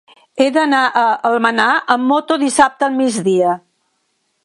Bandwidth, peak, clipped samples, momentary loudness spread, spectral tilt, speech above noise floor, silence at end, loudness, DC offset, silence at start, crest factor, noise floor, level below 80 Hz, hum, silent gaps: 11.5 kHz; 0 dBFS; under 0.1%; 4 LU; -3.5 dB/octave; 52 dB; 0.85 s; -14 LUFS; under 0.1%; 0.35 s; 16 dB; -66 dBFS; -60 dBFS; none; none